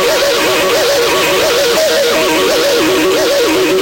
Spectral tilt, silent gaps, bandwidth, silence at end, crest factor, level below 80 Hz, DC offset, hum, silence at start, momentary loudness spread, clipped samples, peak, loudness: -2 dB/octave; none; 16.5 kHz; 0 s; 8 dB; -42 dBFS; under 0.1%; none; 0 s; 0 LU; under 0.1%; -4 dBFS; -10 LUFS